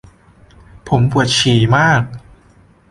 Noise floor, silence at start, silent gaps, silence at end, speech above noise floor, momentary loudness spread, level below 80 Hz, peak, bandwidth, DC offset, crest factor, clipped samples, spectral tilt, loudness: -48 dBFS; 0.85 s; none; 0.7 s; 36 dB; 7 LU; -40 dBFS; -2 dBFS; 11.5 kHz; under 0.1%; 14 dB; under 0.1%; -5 dB/octave; -13 LUFS